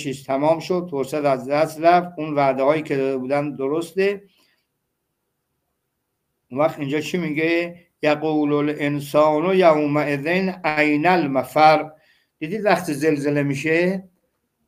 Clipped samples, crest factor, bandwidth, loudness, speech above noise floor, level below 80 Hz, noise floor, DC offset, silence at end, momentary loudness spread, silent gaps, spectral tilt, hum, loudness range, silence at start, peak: under 0.1%; 18 dB; 16 kHz; -20 LUFS; 56 dB; -66 dBFS; -75 dBFS; under 0.1%; 0.65 s; 8 LU; none; -6 dB/octave; none; 9 LU; 0 s; -2 dBFS